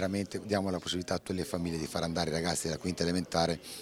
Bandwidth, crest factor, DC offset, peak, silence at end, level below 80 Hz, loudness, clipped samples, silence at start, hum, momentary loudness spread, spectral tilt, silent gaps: 16 kHz; 20 dB; under 0.1%; -14 dBFS; 0 s; -58 dBFS; -33 LUFS; under 0.1%; 0 s; none; 4 LU; -4.5 dB/octave; none